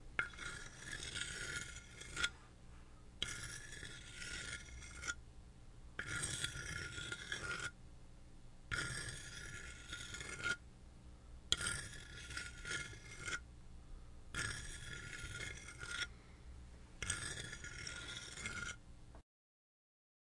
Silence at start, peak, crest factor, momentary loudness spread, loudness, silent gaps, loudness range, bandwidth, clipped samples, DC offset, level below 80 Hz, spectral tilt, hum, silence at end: 0 s; -16 dBFS; 32 dB; 19 LU; -45 LUFS; none; 3 LU; 11.5 kHz; under 0.1%; under 0.1%; -58 dBFS; -1.5 dB/octave; none; 1 s